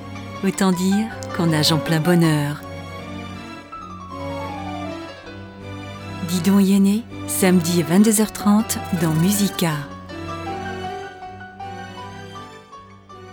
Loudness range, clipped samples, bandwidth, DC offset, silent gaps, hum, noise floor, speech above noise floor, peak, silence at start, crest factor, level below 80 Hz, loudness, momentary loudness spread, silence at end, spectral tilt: 14 LU; under 0.1%; over 20 kHz; under 0.1%; none; none; -42 dBFS; 25 dB; -4 dBFS; 0 s; 18 dB; -52 dBFS; -20 LUFS; 19 LU; 0 s; -5 dB/octave